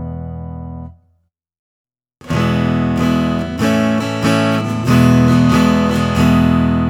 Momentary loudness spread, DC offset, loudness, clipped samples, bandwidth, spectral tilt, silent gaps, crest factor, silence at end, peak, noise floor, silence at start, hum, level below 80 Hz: 16 LU; under 0.1%; -14 LUFS; under 0.1%; 16.5 kHz; -6.5 dB/octave; 1.59-1.85 s; 14 dB; 0 s; 0 dBFS; -62 dBFS; 0 s; none; -32 dBFS